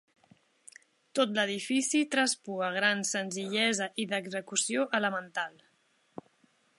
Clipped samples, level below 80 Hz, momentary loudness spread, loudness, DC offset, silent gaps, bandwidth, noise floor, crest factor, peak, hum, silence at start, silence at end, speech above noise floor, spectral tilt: under 0.1%; -84 dBFS; 9 LU; -30 LUFS; under 0.1%; none; 11.5 kHz; -70 dBFS; 22 dB; -10 dBFS; none; 1.15 s; 1.3 s; 39 dB; -2.5 dB/octave